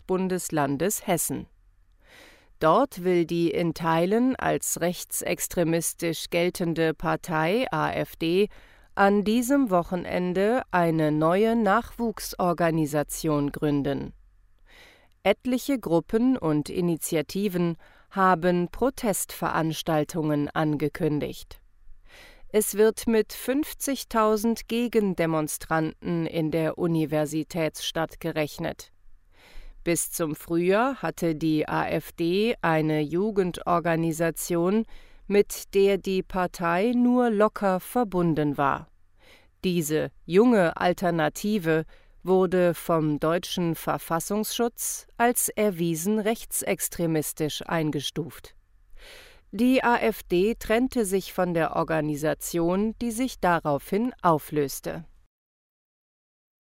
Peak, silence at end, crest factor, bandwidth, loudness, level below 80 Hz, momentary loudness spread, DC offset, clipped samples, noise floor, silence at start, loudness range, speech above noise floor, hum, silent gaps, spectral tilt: -6 dBFS; 1.55 s; 18 dB; 16 kHz; -25 LUFS; -50 dBFS; 7 LU; under 0.1%; under 0.1%; -58 dBFS; 0.1 s; 4 LU; 34 dB; none; none; -5 dB/octave